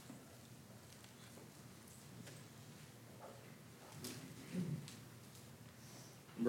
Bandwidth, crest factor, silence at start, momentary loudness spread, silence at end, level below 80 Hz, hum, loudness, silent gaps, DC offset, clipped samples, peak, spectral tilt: 16.5 kHz; 26 dB; 0 s; 12 LU; 0 s; -80 dBFS; none; -54 LUFS; none; under 0.1%; under 0.1%; -24 dBFS; -5 dB/octave